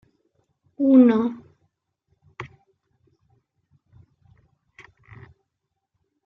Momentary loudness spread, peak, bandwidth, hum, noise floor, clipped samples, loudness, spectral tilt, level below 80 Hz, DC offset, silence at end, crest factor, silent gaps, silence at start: 27 LU; -6 dBFS; 4.1 kHz; none; -80 dBFS; under 0.1%; -18 LUFS; -9 dB/octave; -68 dBFS; under 0.1%; 3.8 s; 20 dB; none; 0.8 s